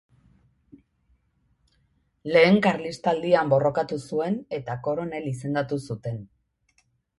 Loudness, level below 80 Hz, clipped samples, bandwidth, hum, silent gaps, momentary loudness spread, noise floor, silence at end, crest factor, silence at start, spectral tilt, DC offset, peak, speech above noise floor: -24 LUFS; -62 dBFS; under 0.1%; 11.5 kHz; none; none; 14 LU; -68 dBFS; 0.95 s; 20 dB; 2.25 s; -6.5 dB/octave; under 0.1%; -6 dBFS; 44 dB